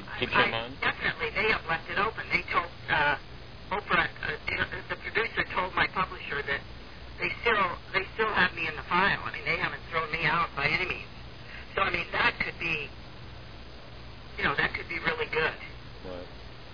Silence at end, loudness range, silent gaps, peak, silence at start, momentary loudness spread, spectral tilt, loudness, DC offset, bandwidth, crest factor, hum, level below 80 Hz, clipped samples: 0 s; 4 LU; none; -8 dBFS; 0 s; 20 LU; -5.5 dB/octave; -28 LUFS; 0.4%; 5.4 kHz; 22 dB; none; -48 dBFS; under 0.1%